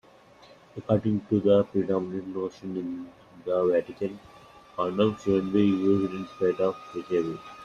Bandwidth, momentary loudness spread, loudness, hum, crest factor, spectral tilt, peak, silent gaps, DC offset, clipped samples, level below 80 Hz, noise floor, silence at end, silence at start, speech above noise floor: 7.2 kHz; 15 LU; -27 LUFS; none; 20 dB; -8 dB/octave; -8 dBFS; none; under 0.1%; under 0.1%; -62 dBFS; -54 dBFS; 0 s; 0.75 s; 28 dB